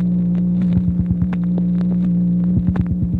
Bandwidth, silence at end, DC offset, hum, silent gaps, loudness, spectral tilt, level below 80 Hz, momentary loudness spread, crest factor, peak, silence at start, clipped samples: 2.8 kHz; 0 s; under 0.1%; 60 Hz at -30 dBFS; none; -18 LUFS; -12 dB/octave; -32 dBFS; 2 LU; 12 dB; -6 dBFS; 0 s; under 0.1%